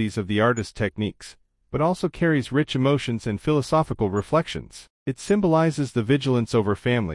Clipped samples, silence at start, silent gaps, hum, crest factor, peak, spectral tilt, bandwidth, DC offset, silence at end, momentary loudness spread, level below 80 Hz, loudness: under 0.1%; 0 s; 4.90-5.06 s; none; 16 dB; -6 dBFS; -6.5 dB/octave; 12 kHz; under 0.1%; 0 s; 11 LU; -48 dBFS; -23 LUFS